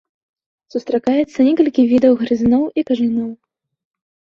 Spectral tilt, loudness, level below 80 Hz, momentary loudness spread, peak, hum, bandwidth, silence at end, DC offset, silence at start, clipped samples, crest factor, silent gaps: -7 dB/octave; -16 LUFS; -52 dBFS; 11 LU; -2 dBFS; none; 6.8 kHz; 1 s; under 0.1%; 0.75 s; under 0.1%; 16 dB; none